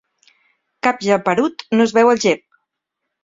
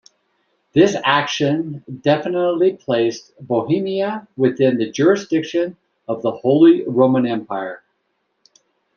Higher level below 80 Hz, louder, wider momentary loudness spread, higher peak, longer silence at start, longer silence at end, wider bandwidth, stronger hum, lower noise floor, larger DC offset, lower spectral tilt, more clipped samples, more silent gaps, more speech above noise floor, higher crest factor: about the same, -62 dBFS vs -62 dBFS; about the same, -17 LUFS vs -18 LUFS; second, 7 LU vs 13 LU; about the same, -2 dBFS vs -2 dBFS; about the same, 0.85 s vs 0.75 s; second, 0.9 s vs 1.2 s; about the same, 7.8 kHz vs 7.2 kHz; neither; first, -78 dBFS vs -70 dBFS; neither; second, -4.5 dB/octave vs -6 dB/octave; neither; neither; first, 63 dB vs 53 dB; about the same, 18 dB vs 16 dB